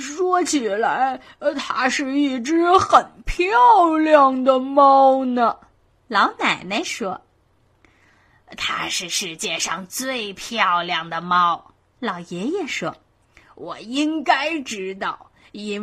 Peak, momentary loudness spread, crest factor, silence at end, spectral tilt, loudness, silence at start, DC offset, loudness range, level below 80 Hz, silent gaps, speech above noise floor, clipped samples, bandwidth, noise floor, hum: 0 dBFS; 15 LU; 20 dB; 0 s; -3 dB/octave; -19 LUFS; 0 s; under 0.1%; 10 LU; -46 dBFS; none; 41 dB; under 0.1%; 15 kHz; -60 dBFS; none